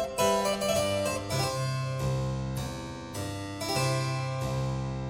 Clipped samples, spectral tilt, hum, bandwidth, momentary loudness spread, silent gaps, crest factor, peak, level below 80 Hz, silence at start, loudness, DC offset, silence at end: under 0.1%; -4.5 dB/octave; none; 17 kHz; 9 LU; none; 16 dB; -14 dBFS; -48 dBFS; 0 s; -30 LUFS; under 0.1%; 0 s